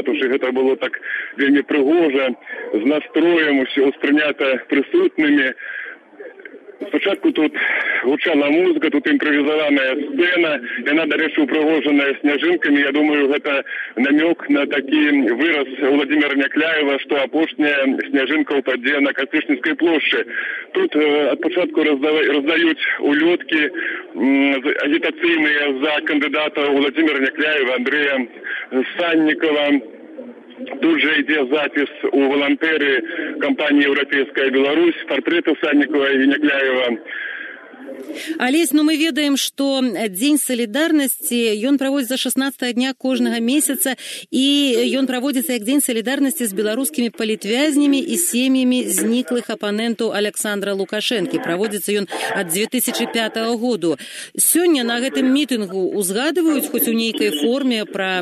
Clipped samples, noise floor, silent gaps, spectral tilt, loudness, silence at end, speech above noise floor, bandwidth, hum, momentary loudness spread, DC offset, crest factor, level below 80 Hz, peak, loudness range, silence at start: under 0.1%; -39 dBFS; none; -2.5 dB/octave; -17 LUFS; 0 s; 21 dB; 13.5 kHz; none; 6 LU; under 0.1%; 14 dB; -80 dBFS; -4 dBFS; 3 LU; 0 s